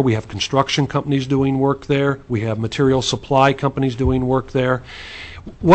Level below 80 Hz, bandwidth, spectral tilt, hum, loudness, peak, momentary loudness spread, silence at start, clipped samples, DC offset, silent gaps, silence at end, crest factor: -38 dBFS; 8.6 kHz; -6 dB/octave; none; -19 LUFS; -2 dBFS; 8 LU; 0 s; under 0.1%; under 0.1%; none; 0 s; 16 dB